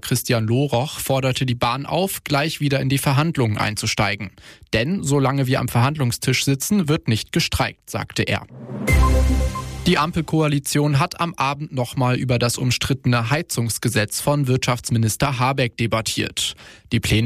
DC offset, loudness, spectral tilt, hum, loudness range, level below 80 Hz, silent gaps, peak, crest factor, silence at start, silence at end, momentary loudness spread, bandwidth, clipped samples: under 0.1%; -20 LUFS; -5 dB/octave; none; 1 LU; -30 dBFS; none; -6 dBFS; 14 dB; 0.05 s; 0 s; 5 LU; 15.5 kHz; under 0.1%